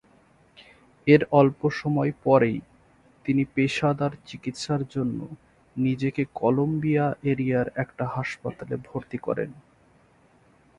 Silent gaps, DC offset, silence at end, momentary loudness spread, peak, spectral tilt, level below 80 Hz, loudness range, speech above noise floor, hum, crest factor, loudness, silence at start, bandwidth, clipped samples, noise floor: none; under 0.1%; 1.2 s; 14 LU; -4 dBFS; -7.5 dB/octave; -58 dBFS; 5 LU; 35 dB; none; 22 dB; -25 LUFS; 1.05 s; 10.5 kHz; under 0.1%; -59 dBFS